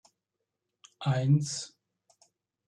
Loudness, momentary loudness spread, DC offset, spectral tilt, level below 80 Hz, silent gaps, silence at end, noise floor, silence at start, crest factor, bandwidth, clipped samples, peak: -29 LUFS; 13 LU; under 0.1%; -6 dB/octave; -72 dBFS; none; 1 s; -86 dBFS; 1 s; 18 dB; 10.5 kHz; under 0.1%; -14 dBFS